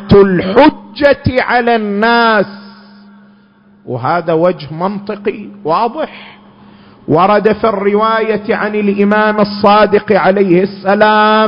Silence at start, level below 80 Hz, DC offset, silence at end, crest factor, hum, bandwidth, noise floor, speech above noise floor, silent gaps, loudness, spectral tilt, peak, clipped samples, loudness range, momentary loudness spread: 0 s; -38 dBFS; under 0.1%; 0 s; 12 dB; none; 5.4 kHz; -45 dBFS; 35 dB; none; -11 LUFS; -8.5 dB/octave; 0 dBFS; 0.2%; 6 LU; 11 LU